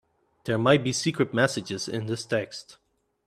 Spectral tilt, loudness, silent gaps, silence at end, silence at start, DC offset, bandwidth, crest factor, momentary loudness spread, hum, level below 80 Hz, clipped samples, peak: -4.5 dB/octave; -26 LUFS; none; 0.55 s; 0.45 s; under 0.1%; 14 kHz; 20 dB; 14 LU; none; -62 dBFS; under 0.1%; -6 dBFS